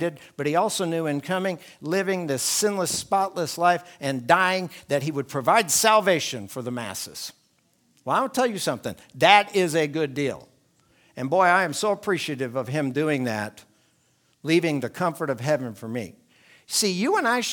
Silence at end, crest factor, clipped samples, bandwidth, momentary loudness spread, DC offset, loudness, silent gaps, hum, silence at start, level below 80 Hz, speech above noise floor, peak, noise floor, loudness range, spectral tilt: 0 s; 24 dB; under 0.1%; 19.5 kHz; 14 LU; under 0.1%; -23 LUFS; none; none; 0 s; -70 dBFS; 42 dB; 0 dBFS; -65 dBFS; 5 LU; -3.5 dB/octave